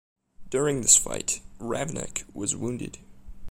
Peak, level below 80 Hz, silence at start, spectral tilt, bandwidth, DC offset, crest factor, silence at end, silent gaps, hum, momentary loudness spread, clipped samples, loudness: -6 dBFS; -48 dBFS; 0.4 s; -2.5 dB/octave; 16 kHz; under 0.1%; 22 dB; 0 s; none; none; 16 LU; under 0.1%; -25 LUFS